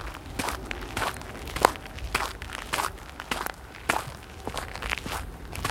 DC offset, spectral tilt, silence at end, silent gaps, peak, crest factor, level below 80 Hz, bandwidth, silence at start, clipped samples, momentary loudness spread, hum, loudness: under 0.1%; -3 dB/octave; 0 s; none; 0 dBFS; 32 dB; -42 dBFS; 17 kHz; 0 s; under 0.1%; 12 LU; none; -31 LUFS